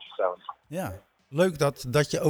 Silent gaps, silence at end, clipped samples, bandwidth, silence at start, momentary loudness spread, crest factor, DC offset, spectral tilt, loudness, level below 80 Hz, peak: none; 0 s; under 0.1%; over 20 kHz; 0 s; 14 LU; 18 dB; under 0.1%; -5.5 dB/octave; -28 LUFS; -56 dBFS; -10 dBFS